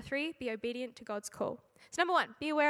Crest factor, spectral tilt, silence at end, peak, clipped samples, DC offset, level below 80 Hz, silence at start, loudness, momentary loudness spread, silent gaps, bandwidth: 20 dB; -3.5 dB/octave; 0 s; -14 dBFS; under 0.1%; under 0.1%; -70 dBFS; 0 s; -36 LUFS; 11 LU; none; 15.5 kHz